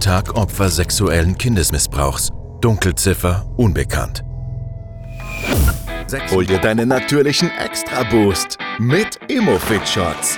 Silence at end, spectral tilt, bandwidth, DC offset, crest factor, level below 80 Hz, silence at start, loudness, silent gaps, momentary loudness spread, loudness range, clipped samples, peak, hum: 0 s; -4.5 dB/octave; over 20 kHz; 0.2%; 16 dB; -28 dBFS; 0 s; -17 LUFS; none; 11 LU; 3 LU; under 0.1%; -2 dBFS; none